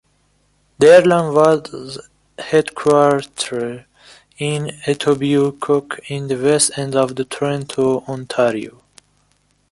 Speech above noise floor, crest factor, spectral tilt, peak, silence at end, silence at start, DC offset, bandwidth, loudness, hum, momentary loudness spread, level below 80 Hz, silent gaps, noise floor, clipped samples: 45 dB; 16 dB; -4.5 dB/octave; 0 dBFS; 1 s; 0.8 s; under 0.1%; 11.5 kHz; -16 LUFS; 50 Hz at -45 dBFS; 15 LU; -56 dBFS; none; -61 dBFS; under 0.1%